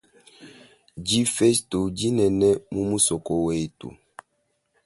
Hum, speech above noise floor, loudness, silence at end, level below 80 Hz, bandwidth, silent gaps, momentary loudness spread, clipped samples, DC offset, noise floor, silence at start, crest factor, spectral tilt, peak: none; 50 dB; -23 LUFS; 0.95 s; -50 dBFS; 12 kHz; none; 13 LU; under 0.1%; under 0.1%; -73 dBFS; 0.4 s; 20 dB; -4.5 dB/octave; -6 dBFS